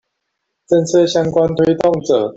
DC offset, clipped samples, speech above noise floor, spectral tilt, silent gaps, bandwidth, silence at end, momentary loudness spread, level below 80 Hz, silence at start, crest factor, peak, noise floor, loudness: under 0.1%; under 0.1%; 60 dB; -6 dB/octave; none; 8 kHz; 0.05 s; 3 LU; -48 dBFS; 0.7 s; 14 dB; -2 dBFS; -74 dBFS; -14 LUFS